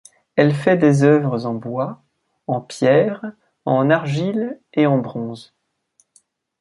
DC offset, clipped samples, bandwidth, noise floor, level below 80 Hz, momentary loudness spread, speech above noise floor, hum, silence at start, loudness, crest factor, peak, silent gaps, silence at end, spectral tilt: under 0.1%; under 0.1%; 11.5 kHz; -63 dBFS; -62 dBFS; 15 LU; 45 dB; none; 0.35 s; -18 LUFS; 18 dB; -2 dBFS; none; 1.2 s; -7.5 dB/octave